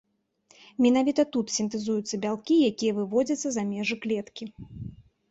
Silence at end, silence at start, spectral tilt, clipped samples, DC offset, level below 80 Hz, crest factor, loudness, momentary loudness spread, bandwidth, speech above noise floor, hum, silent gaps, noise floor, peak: 0.35 s; 0.8 s; -4.5 dB/octave; under 0.1%; under 0.1%; -60 dBFS; 16 dB; -26 LUFS; 19 LU; 8 kHz; 38 dB; none; none; -64 dBFS; -10 dBFS